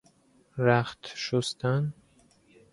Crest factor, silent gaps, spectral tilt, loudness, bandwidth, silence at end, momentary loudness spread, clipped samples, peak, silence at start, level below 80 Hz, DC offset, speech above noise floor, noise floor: 20 dB; none; -5.5 dB/octave; -28 LUFS; 11.5 kHz; 0.8 s; 11 LU; under 0.1%; -10 dBFS; 0.55 s; -66 dBFS; under 0.1%; 36 dB; -63 dBFS